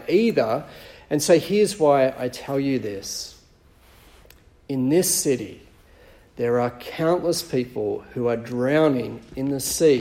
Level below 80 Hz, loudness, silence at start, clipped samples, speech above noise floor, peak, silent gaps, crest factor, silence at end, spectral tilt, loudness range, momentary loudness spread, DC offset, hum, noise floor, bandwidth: -54 dBFS; -22 LUFS; 0 s; under 0.1%; 32 dB; -4 dBFS; none; 20 dB; 0 s; -4.5 dB/octave; 4 LU; 12 LU; under 0.1%; none; -54 dBFS; 16.5 kHz